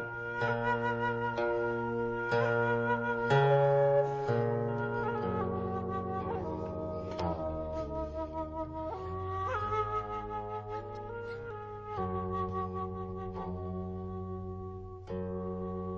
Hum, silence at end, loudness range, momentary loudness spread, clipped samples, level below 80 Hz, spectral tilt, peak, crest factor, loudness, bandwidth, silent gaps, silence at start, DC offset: none; 0 s; 9 LU; 12 LU; under 0.1%; -50 dBFS; -8 dB/octave; -14 dBFS; 18 dB; -34 LUFS; 7.8 kHz; none; 0 s; under 0.1%